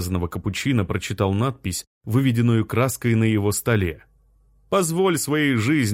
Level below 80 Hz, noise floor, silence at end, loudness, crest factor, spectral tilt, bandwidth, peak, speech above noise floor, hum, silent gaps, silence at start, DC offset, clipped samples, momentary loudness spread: -46 dBFS; -57 dBFS; 0 s; -22 LUFS; 14 dB; -5.5 dB/octave; 16.5 kHz; -6 dBFS; 37 dB; none; 1.87-2.01 s; 0 s; under 0.1%; under 0.1%; 7 LU